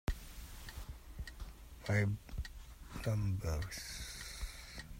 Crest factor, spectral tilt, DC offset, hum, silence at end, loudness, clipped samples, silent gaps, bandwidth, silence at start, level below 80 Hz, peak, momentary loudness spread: 18 dB; -5 dB/octave; under 0.1%; none; 0 s; -42 LUFS; under 0.1%; none; 16 kHz; 0.05 s; -48 dBFS; -22 dBFS; 16 LU